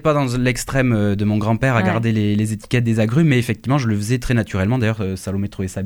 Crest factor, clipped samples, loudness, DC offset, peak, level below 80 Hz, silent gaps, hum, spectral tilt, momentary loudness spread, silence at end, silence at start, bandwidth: 14 dB; under 0.1%; -19 LUFS; under 0.1%; -4 dBFS; -38 dBFS; none; none; -6.5 dB/octave; 6 LU; 0 s; 0.05 s; 18.5 kHz